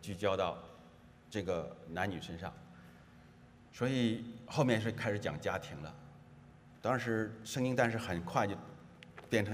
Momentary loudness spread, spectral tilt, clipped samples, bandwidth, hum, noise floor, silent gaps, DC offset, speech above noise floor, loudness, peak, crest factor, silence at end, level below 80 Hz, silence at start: 22 LU; -6 dB/octave; under 0.1%; 15.5 kHz; none; -59 dBFS; none; under 0.1%; 23 dB; -37 LUFS; -16 dBFS; 22 dB; 0 s; -66 dBFS; 0 s